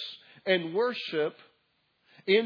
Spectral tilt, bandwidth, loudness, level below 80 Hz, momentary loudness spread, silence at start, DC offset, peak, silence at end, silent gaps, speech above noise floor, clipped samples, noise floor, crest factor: -6.5 dB/octave; 5.4 kHz; -30 LUFS; under -90 dBFS; 13 LU; 0 s; under 0.1%; -12 dBFS; 0 s; none; 44 dB; under 0.1%; -73 dBFS; 20 dB